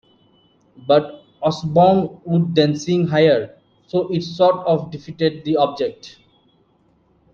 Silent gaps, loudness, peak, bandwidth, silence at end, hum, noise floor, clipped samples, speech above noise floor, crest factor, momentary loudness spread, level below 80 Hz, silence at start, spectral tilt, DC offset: none; -18 LUFS; -2 dBFS; 7.2 kHz; 1.25 s; none; -59 dBFS; under 0.1%; 41 dB; 18 dB; 10 LU; -58 dBFS; 0.8 s; -7 dB/octave; under 0.1%